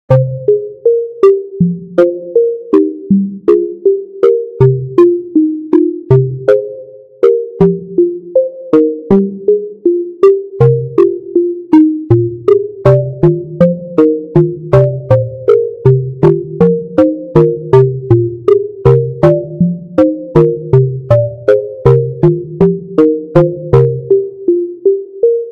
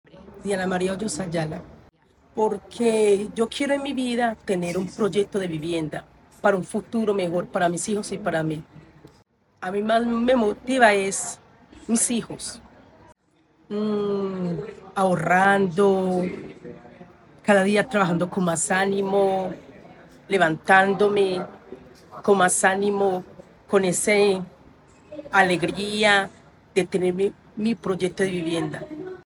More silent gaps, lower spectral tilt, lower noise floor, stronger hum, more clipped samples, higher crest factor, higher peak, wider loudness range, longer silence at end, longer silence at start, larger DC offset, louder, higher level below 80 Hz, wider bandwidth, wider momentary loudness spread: neither; first, -11 dB/octave vs -4.5 dB/octave; second, -31 dBFS vs -61 dBFS; neither; first, 0.4% vs under 0.1%; second, 10 dB vs 20 dB; first, 0 dBFS vs -4 dBFS; second, 1 LU vs 4 LU; about the same, 0 s vs 0.1 s; about the same, 0.1 s vs 0.15 s; neither; first, -11 LUFS vs -23 LUFS; first, -40 dBFS vs -58 dBFS; second, 5.4 kHz vs 19 kHz; second, 4 LU vs 15 LU